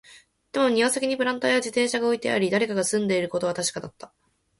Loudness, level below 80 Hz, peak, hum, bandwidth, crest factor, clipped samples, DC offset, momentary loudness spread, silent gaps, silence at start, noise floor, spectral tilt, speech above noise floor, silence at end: -24 LUFS; -66 dBFS; -8 dBFS; none; 12 kHz; 18 dB; under 0.1%; under 0.1%; 6 LU; none; 0.1 s; -53 dBFS; -3.5 dB/octave; 30 dB; 0.55 s